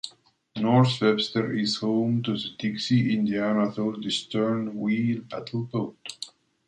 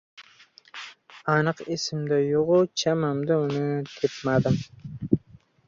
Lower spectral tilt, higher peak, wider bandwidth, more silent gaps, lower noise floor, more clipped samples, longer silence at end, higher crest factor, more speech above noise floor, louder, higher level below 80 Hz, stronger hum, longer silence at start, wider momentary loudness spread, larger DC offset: about the same, -6 dB/octave vs -6 dB/octave; second, -8 dBFS vs -4 dBFS; first, 9.4 kHz vs 7.6 kHz; neither; about the same, -55 dBFS vs -55 dBFS; neither; about the same, 0.4 s vs 0.5 s; about the same, 18 dB vs 22 dB; about the same, 30 dB vs 31 dB; about the same, -26 LUFS vs -25 LUFS; second, -66 dBFS vs -56 dBFS; neither; second, 0.05 s vs 0.2 s; second, 13 LU vs 18 LU; neither